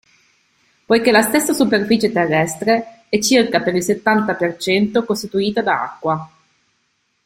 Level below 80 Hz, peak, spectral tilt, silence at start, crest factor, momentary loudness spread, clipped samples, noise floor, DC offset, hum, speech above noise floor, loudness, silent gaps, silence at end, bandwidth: -56 dBFS; 0 dBFS; -4 dB/octave; 0.9 s; 16 dB; 7 LU; under 0.1%; -66 dBFS; under 0.1%; none; 50 dB; -17 LUFS; none; 1 s; 16.5 kHz